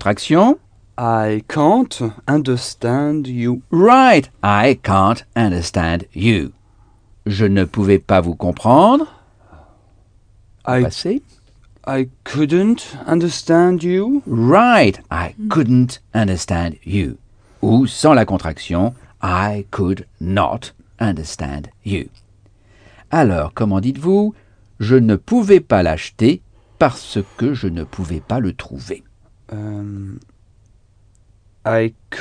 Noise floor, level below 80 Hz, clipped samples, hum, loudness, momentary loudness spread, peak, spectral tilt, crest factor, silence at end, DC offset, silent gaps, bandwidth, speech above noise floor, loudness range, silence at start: -52 dBFS; -40 dBFS; under 0.1%; none; -16 LUFS; 14 LU; 0 dBFS; -6.5 dB/octave; 16 dB; 0 s; under 0.1%; none; 10 kHz; 36 dB; 9 LU; 0 s